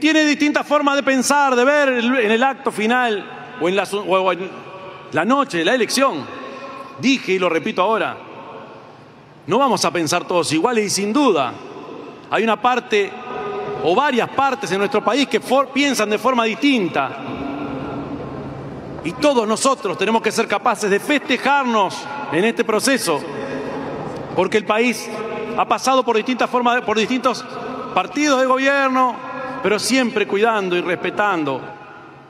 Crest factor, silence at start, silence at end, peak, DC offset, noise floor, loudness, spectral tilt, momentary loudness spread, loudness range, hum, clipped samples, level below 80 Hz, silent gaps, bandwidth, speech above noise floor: 18 dB; 0 s; 0.05 s; -2 dBFS; under 0.1%; -43 dBFS; -18 LUFS; -3.5 dB/octave; 13 LU; 3 LU; none; under 0.1%; -58 dBFS; none; 15.5 kHz; 25 dB